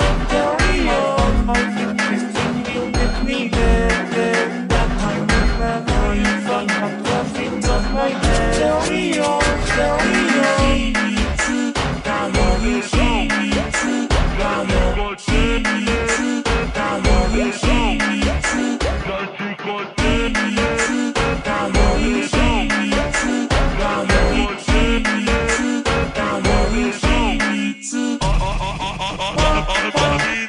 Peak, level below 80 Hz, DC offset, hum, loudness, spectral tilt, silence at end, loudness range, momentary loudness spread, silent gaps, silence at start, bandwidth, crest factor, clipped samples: -2 dBFS; -22 dBFS; under 0.1%; none; -18 LUFS; -4.5 dB/octave; 0 s; 2 LU; 4 LU; none; 0 s; 11 kHz; 16 dB; under 0.1%